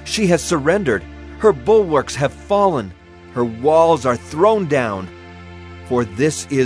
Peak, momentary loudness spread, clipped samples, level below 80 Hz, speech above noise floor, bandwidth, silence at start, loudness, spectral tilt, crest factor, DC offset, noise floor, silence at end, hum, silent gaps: -2 dBFS; 20 LU; under 0.1%; -42 dBFS; 20 dB; 11 kHz; 0 s; -17 LUFS; -5.5 dB/octave; 16 dB; under 0.1%; -36 dBFS; 0 s; none; none